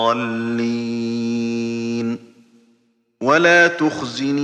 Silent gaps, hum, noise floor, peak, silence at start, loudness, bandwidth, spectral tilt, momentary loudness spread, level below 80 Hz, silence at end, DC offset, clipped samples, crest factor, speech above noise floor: none; none; -62 dBFS; 0 dBFS; 0 s; -18 LUFS; 9.2 kHz; -5 dB/octave; 12 LU; -68 dBFS; 0 s; under 0.1%; under 0.1%; 18 dB; 45 dB